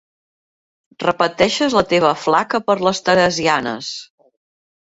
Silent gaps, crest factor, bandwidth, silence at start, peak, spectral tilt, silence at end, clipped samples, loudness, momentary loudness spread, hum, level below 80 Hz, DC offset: none; 18 dB; 8 kHz; 1 s; -2 dBFS; -4 dB/octave; 0.85 s; under 0.1%; -17 LUFS; 9 LU; none; -54 dBFS; under 0.1%